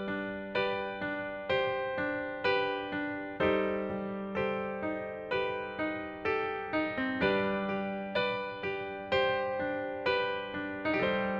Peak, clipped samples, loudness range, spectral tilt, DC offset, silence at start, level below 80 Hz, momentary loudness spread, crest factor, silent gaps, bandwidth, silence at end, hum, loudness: -16 dBFS; under 0.1%; 2 LU; -7 dB/octave; under 0.1%; 0 s; -62 dBFS; 7 LU; 18 dB; none; 7 kHz; 0 s; none; -33 LUFS